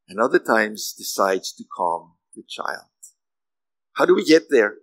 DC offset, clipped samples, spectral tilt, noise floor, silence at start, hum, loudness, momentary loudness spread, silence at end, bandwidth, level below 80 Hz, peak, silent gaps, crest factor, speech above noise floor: under 0.1%; under 0.1%; -3.5 dB/octave; under -90 dBFS; 0.1 s; none; -20 LUFS; 16 LU; 0.1 s; 16 kHz; -84 dBFS; -2 dBFS; none; 20 dB; over 70 dB